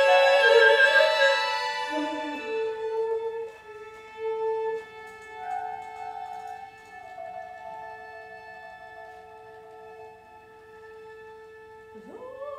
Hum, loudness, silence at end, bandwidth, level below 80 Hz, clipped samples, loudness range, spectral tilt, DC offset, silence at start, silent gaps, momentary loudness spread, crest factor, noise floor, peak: none; -23 LUFS; 0 s; 14 kHz; -72 dBFS; under 0.1%; 23 LU; -1.5 dB/octave; under 0.1%; 0 s; none; 28 LU; 20 dB; -50 dBFS; -8 dBFS